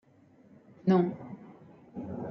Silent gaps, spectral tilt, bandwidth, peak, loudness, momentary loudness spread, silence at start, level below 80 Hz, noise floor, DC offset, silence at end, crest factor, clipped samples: none; -10 dB/octave; 6 kHz; -12 dBFS; -30 LUFS; 22 LU; 0.85 s; -70 dBFS; -60 dBFS; under 0.1%; 0 s; 20 dB; under 0.1%